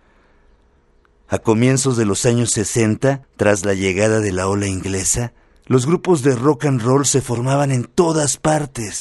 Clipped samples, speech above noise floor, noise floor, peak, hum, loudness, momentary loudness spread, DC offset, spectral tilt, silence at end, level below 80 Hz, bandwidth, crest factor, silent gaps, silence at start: under 0.1%; 38 dB; -55 dBFS; -2 dBFS; none; -17 LUFS; 5 LU; under 0.1%; -5 dB/octave; 0 s; -44 dBFS; 12 kHz; 16 dB; none; 1.3 s